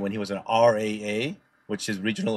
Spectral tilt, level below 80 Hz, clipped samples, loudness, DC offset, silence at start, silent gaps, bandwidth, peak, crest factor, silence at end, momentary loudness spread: -5 dB/octave; -68 dBFS; under 0.1%; -26 LUFS; under 0.1%; 0 s; none; 13.5 kHz; -8 dBFS; 18 dB; 0 s; 12 LU